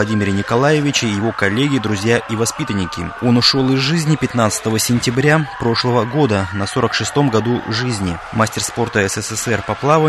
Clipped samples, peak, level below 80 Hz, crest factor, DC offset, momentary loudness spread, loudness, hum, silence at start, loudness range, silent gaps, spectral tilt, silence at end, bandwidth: under 0.1%; 0 dBFS; -44 dBFS; 16 dB; under 0.1%; 6 LU; -16 LUFS; none; 0 s; 2 LU; none; -4.5 dB/octave; 0 s; 12.5 kHz